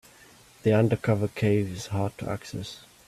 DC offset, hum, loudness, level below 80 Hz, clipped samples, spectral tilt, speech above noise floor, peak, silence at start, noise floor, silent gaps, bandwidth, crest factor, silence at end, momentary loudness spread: under 0.1%; none; -27 LUFS; -56 dBFS; under 0.1%; -7 dB/octave; 28 dB; -10 dBFS; 0.65 s; -54 dBFS; none; 14 kHz; 18 dB; 0.3 s; 13 LU